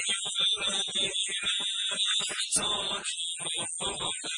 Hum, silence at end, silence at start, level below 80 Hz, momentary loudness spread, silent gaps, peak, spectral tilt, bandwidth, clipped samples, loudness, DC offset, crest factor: none; 0 s; 0 s; -64 dBFS; 5 LU; none; -12 dBFS; 0.5 dB/octave; 11 kHz; under 0.1%; -28 LUFS; under 0.1%; 18 dB